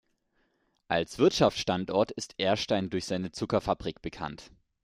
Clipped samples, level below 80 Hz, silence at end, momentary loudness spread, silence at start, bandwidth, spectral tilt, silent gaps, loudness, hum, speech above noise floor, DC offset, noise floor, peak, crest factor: under 0.1%; -56 dBFS; 0.35 s; 13 LU; 0.9 s; 15.5 kHz; -5 dB/octave; none; -29 LUFS; none; 44 dB; under 0.1%; -73 dBFS; -8 dBFS; 22 dB